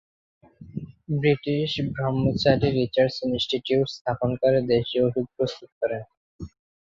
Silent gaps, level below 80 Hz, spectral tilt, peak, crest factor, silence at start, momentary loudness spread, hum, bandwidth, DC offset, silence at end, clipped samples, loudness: 4.01-4.05 s, 5.72-5.81 s, 6.17-6.39 s; -50 dBFS; -7 dB/octave; -4 dBFS; 20 dB; 0.6 s; 17 LU; none; 7.6 kHz; under 0.1%; 0.35 s; under 0.1%; -24 LUFS